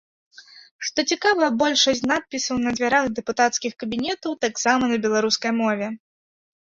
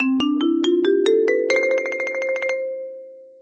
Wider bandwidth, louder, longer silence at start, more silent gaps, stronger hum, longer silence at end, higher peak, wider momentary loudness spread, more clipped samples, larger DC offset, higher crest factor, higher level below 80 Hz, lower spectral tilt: second, 7.8 kHz vs 8.6 kHz; about the same, -21 LUFS vs -20 LUFS; first, 0.4 s vs 0 s; first, 0.71-0.79 s vs none; neither; first, 0.75 s vs 0.15 s; about the same, -6 dBFS vs -6 dBFS; second, 8 LU vs 12 LU; neither; neither; about the same, 18 dB vs 14 dB; first, -60 dBFS vs -68 dBFS; about the same, -2.5 dB/octave vs -3.5 dB/octave